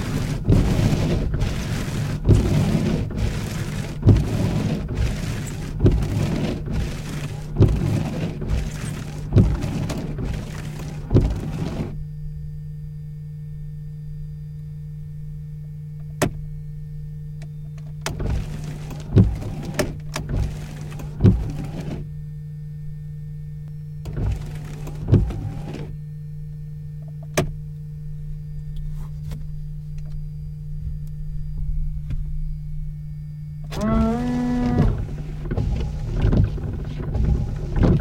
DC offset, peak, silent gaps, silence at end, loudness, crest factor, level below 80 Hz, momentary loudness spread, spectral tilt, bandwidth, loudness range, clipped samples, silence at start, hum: under 0.1%; -4 dBFS; none; 0 s; -25 LUFS; 20 dB; -30 dBFS; 15 LU; -7 dB/octave; 16 kHz; 11 LU; under 0.1%; 0 s; none